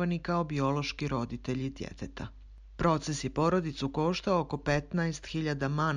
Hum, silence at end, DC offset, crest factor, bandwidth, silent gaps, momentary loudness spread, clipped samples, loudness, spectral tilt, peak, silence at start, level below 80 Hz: none; 0 s; under 0.1%; 18 dB; 10.5 kHz; none; 12 LU; under 0.1%; -32 LUFS; -6 dB/octave; -14 dBFS; 0 s; -48 dBFS